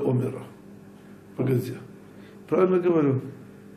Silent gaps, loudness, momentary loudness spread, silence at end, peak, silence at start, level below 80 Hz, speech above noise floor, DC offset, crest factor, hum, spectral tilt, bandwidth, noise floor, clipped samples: none; -25 LUFS; 25 LU; 0 s; -10 dBFS; 0 s; -68 dBFS; 23 dB; under 0.1%; 18 dB; none; -9 dB/octave; 14.5 kHz; -47 dBFS; under 0.1%